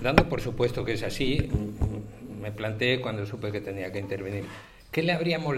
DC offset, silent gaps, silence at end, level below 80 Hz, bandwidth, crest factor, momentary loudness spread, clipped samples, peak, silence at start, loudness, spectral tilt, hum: under 0.1%; none; 0 s; -40 dBFS; 16 kHz; 26 dB; 12 LU; under 0.1%; -2 dBFS; 0 s; -29 LUFS; -6 dB/octave; none